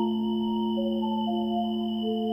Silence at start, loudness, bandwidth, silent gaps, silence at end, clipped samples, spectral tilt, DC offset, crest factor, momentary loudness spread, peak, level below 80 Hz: 0 s; -28 LUFS; 5.6 kHz; none; 0 s; under 0.1%; -9 dB/octave; under 0.1%; 10 dB; 1 LU; -18 dBFS; -66 dBFS